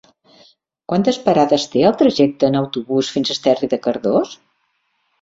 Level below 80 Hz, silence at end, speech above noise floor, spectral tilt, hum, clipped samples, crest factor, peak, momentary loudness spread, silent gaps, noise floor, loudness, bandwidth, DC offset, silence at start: -58 dBFS; 0.9 s; 51 dB; -5.5 dB/octave; none; under 0.1%; 16 dB; -2 dBFS; 6 LU; none; -67 dBFS; -17 LUFS; 7.8 kHz; under 0.1%; 0.9 s